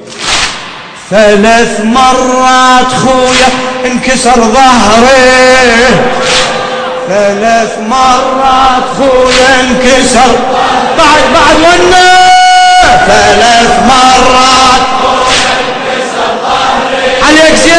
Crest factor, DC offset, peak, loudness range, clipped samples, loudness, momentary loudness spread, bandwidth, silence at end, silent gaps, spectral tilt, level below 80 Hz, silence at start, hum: 4 dB; under 0.1%; 0 dBFS; 4 LU; 9%; -5 LUFS; 8 LU; 11 kHz; 0 s; none; -2.5 dB/octave; -28 dBFS; 0 s; none